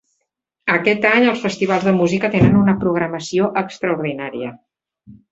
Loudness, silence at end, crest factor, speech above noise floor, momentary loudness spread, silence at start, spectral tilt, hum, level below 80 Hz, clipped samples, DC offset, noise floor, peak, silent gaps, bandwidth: -17 LUFS; 0.2 s; 18 dB; 58 dB; 12 LU; 0.65 s; -6.5 dB/octave; none; -46 dBFS; under 0.1%; under 0.1%; -75 dBFS; 0 dBFS; none; 8 kHz